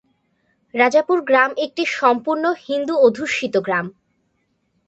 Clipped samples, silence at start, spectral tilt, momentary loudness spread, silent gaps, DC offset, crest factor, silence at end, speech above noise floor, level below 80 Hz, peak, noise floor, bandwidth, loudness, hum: under 0.1%; 0.75 s; -4.5 dB/octave; 7 LU; none; under 0.1%; 18 dB; 0.95 s; 50 dB; -68 dBFS; -2 dBFS; -68 dBFS; 8.2 kHz; -18 LUFS; none